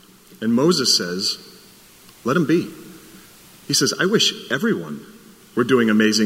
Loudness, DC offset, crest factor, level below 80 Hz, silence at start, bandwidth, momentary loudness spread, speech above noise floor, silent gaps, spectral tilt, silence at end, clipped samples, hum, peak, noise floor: -19 LUFS; under 0.1%; 18 dB; -64 dBFS; 0.4 s; 16 kHz; 14 LU; 29 dB; none; -3.5 dB/octave; 0 s; under 0.1%; none; -4 dBFS; -47 dBFS